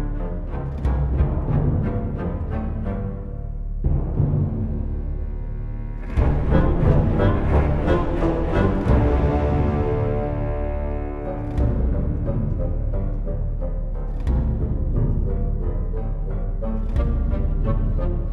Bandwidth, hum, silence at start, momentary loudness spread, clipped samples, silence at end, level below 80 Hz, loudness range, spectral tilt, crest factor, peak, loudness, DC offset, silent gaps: 4.3 kHz; none; 0 s; 10 LU; under 0.1%; 0 s; -24 dBFS; 6 LU; -10 dB/octave; 18 dB; -4 dBFS; -24 LUFS; under 0.1%; none